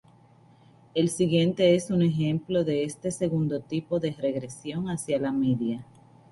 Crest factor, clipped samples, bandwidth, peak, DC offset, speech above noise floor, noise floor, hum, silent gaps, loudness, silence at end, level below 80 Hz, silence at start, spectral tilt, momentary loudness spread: 18 dB; under 0.1%; 11.5 kHz; -10 dBFS; under 0.1%; 31 dB; -56 dBFS; none; none; -27 LUFS; 0.5 s; -60 dBFS; 0.95 s; -6.5 dB/octave; 10 LU